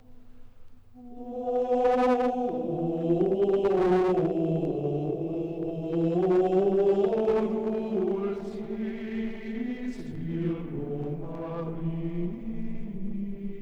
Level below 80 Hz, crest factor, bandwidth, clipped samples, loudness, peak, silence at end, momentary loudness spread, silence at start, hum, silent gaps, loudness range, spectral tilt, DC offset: -48 dBFS; 14 dB; 7.8 kHz; under 0.1%; -28 LUFS; -12 dBFS; 0 s; 12 LU; 0.1 s; none; none; 8 LU; -9 dB/octave; under 0.1%